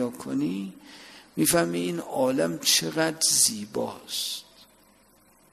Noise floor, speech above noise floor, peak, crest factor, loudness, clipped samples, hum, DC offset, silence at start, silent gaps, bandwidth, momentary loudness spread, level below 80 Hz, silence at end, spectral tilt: -59 dBFS; 33 dB; -8 dBFS; 20 dB; -25 LUFS; under 0.1%; none; under 0.1%; 0 s; none; 15 kHz; 17 LU; -62 dBFS; 1.1 s; -2.5 dB/octave